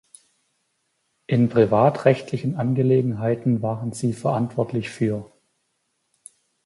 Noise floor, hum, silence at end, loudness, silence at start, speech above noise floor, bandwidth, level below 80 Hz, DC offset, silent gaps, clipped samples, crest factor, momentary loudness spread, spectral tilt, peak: -73 dBFS; none; 1.4 s; -22 LUFS; 1.3 s; 52 dB; 11.5 kHz; -60 dBFS; under 0.1%; none; under 0.1%; 20 dB; 9 LU; -8 dB/octave; -2 dBFS